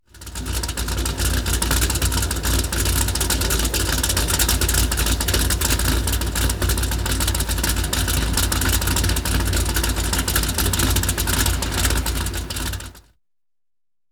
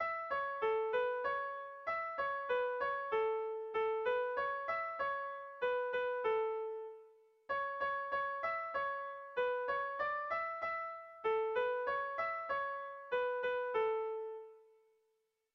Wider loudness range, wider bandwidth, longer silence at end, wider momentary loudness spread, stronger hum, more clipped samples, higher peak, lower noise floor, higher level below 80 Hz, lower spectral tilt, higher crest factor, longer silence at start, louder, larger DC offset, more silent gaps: about the same, 2 LU vs 2 LU; first, over 20 kHz vs 6 kHz; first, 1.1 s vs 0.95 s; about the same, 6 LU vs 7 LU; neither; neither; first, -4 dBFS vs -26 dBFS; first, under -90 dBFS vs -82 dBFS; first, -24 dBFS vs -76 dBFS; second, -3 dB/octave vs -4.5 dB/octave; about the same, 16 dB vs 14 dB; first, 0.15 s vs 0 s; first, -20 LUFS vs -38 LUFS; neither; neither